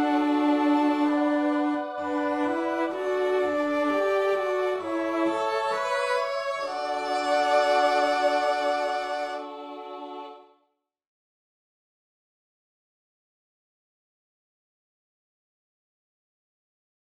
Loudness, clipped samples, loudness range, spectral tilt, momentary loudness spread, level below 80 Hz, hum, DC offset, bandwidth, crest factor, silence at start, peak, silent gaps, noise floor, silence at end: -25 LUFS; under 0.1%; 11 LU; -3.5 dB/octave; 11 LU; -74 dBFS; none; under 0.1%; 12 kHz; 16 dB; 0 s; -12 dBFS; none; -75 dBFS; 6.7 s